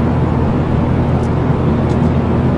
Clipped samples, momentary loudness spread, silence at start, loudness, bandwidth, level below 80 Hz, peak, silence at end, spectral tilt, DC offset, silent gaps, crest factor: under 0.1%; 1 LU; 0 s; -15 LUFS; 8.2 kHz; -28 dBFS; -2 dBFS; 0 s; -9.5 dB/octave; under 0.1%; none; 12 dB